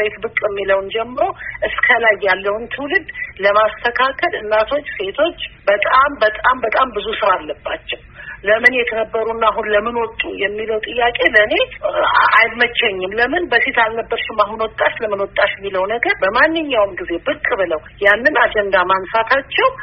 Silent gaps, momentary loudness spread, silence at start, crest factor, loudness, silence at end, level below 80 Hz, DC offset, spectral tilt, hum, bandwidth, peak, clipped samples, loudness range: none; 9 LU; 0 s; 16 dB; -16 LUFS; 0 s; -44 dBFS; under 0.1%; 0 dB/octave; none; 5.6 kHz; 0 dBFS; under 0.1%; 3 LU